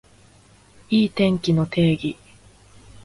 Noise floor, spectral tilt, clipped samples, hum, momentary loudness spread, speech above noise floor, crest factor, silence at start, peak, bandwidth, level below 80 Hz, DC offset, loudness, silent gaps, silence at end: -52 dBFS; -7 dB/octave; under 0.1%; 50 Hz at -45 dBFS; 9 LU; 33 dB; 18 dB; 0.9 s; -6 dBFS; 11.5 kHz; -52 dBFS; under 0.1%; -21 LUFS; none; 0.9 s